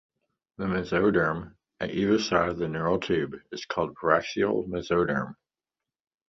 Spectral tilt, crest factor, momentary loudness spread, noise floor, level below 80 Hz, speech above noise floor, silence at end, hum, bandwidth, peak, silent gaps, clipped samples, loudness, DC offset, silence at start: -6 dB/octave; 22 dB; 11 LU; under -90 dBFS; -54 dBFS; over 64 dB; 0.95 s; none; 7.6 kHz; -6 dBFS; none; under 0.1%; -27 LUFS; under 0.1%; 0.6 s